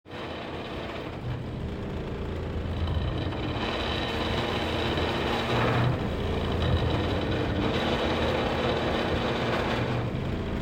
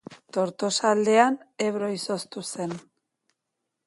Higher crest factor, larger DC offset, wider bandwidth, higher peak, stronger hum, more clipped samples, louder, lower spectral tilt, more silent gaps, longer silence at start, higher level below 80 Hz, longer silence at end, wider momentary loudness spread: second, 16 dB vs 22 dB; neither; first, 16 kHz vs 11.5 kHz; second, -12 dBFS vs -4 dBFS; neither; neither; second, -29 LUFS vs -25 LUFS; first, -6.5 dB/octave vs -4 dB/octave; neither; about the same, 0.05 s vs 0.1 s; first, -40 dBFS vs -74 dBFS; second, 0 s vs 1.05 s; second, 8 LU vs 13 LU